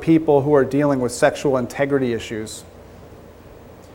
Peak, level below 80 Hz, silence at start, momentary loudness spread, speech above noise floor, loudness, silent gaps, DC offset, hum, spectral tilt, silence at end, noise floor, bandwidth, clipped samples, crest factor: -2 dBFS; -50 dBFS; 0 s; 14 LU; 24 dB; -19 LUFS; none; under 0.1%; none; -6 dB/octave; 0.1 s; -42 dBFS; 16.5 kHz; under 0.1%; 18 dB